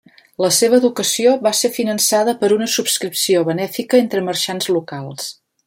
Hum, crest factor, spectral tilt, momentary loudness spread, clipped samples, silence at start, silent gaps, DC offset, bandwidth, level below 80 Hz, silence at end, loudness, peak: none; 16 dB; -3 dB/octave; 8 LU; under 0.1%; 0.4 s; none; under 0.1%; 16.5 kHz; -64 dBFS; 0.35 s; -16 LUFS; -2 dBFS